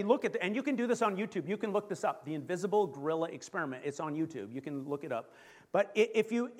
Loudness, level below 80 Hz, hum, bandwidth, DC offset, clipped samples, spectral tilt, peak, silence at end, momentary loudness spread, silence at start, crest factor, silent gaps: -34 LUFS; -84 dBFS; none; 14 kHz; under 0.1%; under 0.1%; -5.5 dB/octave; -12 dBFS; 0 s; 9 LU; 0 s; 20 dB; none